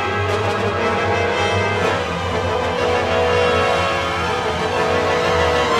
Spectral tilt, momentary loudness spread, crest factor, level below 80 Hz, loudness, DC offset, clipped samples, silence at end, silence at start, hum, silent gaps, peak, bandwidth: -4.5 dB/octave; 4 LU; 12 dB; -40 dBFS; -18 LUFS; under 0.1%; under 0.1%; 0 s; 0 s; none; none; -6 dBFS; 13.5 kHz